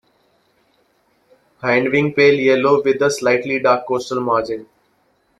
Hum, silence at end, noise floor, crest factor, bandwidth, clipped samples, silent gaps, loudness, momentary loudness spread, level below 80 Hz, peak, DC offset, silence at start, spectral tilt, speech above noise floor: none; 0.75 s; -61 dBFS; 16 dB; 12.5 kHz; under 0.1%; none; -16 LUFS; 8 LU; -60 dBFS; -2 dBFS; under 0.1%; 1.65 s; -5 dB/octave; 45 dB